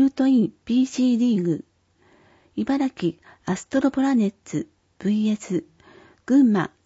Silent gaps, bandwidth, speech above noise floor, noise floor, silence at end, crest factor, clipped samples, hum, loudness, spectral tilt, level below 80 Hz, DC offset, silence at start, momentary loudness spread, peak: none; 8 kHz; 39 dB; -60 dBFS; 0.2 s; 14 dB; under 0.1%; none; -22 LUFS; -6.5 dB/octave; -62 dBFS; under 0.1%; 0 s; 12 LU; -8 dBFS